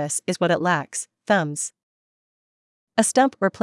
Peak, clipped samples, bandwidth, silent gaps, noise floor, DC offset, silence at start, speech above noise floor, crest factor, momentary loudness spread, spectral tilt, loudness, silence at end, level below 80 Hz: -4 dBFS; under 0.1%; 12 kHz; 1.83-2.87 s; under -90 dBFS; under 0.1%; 0 s; over 68 dB; 20 dB; 11 LU; -4 dB/octave; -22 LUFS; 0.05 s; -72 dBFS